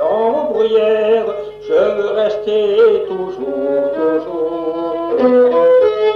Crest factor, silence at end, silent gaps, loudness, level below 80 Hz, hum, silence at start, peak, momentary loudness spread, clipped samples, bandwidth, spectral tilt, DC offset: 10 dB; 0 s; none; -15 LUFS; -54 dBFS; 50 Hz at -50 dBFS; 0 s; -2 dBFS; 9 LU; under 0.1%; 6.2 kHz; -6.5 dB/octave; under 0.1%